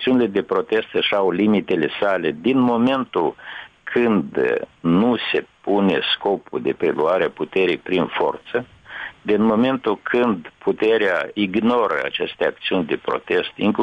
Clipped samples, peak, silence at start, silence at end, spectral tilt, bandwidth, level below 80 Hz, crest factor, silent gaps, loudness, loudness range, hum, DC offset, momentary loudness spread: under 0.1%; -8 dBFS; 0 s; 0 s; -7.5 dB/octave; 7 kHz; -58 dBFS; 12 dB; none; -20 LUFS; 2 LU; none; under 0.1%; 7 LU